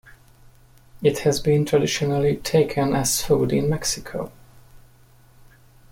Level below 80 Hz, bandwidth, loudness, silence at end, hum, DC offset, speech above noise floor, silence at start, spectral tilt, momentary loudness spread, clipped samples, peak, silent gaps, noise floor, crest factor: -46 dBFS; 16.5 kHz; -21 LUFS; 1.15 s; none; under 0.1%; 31 dB; 0.05 s; -5 dB/octave; 7 LU; under 0.1%; -6 dBFS; none; -52 dBFS; 18 dB